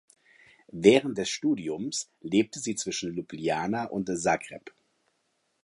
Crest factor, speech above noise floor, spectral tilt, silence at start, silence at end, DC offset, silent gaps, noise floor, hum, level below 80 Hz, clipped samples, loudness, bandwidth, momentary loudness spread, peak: 24 dB; 47 dB; -4 dB/octave; 0.75 s; 0.95 s; under 0.1%; none; -75 dBFS; none; -66 dBFS; under 0.1%; -28 LUFS; 11.5 kHz; 13 LU; -4 dBFS